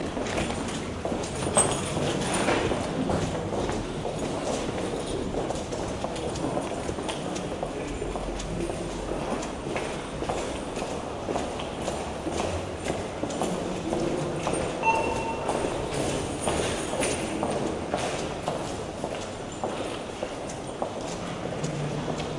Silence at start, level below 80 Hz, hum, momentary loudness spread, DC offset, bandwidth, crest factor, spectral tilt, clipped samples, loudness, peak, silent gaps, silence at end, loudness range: 0 s; -44 dBFS; none; 7 LU; under 0.1%; 11.5 kHz; 22 dB; -4.5 dB/octave; under 0.1%; -30 LUFS; -8 dBFS; none; 0 s; 5 LU